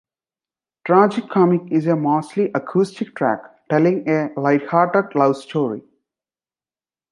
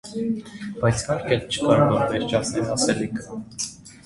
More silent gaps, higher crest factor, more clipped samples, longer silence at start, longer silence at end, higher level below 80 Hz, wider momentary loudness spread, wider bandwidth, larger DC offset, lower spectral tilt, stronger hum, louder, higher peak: neither; about the same, 18 dB vs 20 dB; neither; first, 0.85 s vs 0.05 s; first, 1.3 s vs 0.1 s; second, -70 dBFS vs -48 dBFS; second, 7 LU vs 12 LU; about the same, 11 kHz vs 11.5 kHz; neither; first, -8 dB/octave vs -5 dB/octave; neither; first, -19 LUFS vs -23 LUFS; about the same, -2 dBFS vs -4 dBFS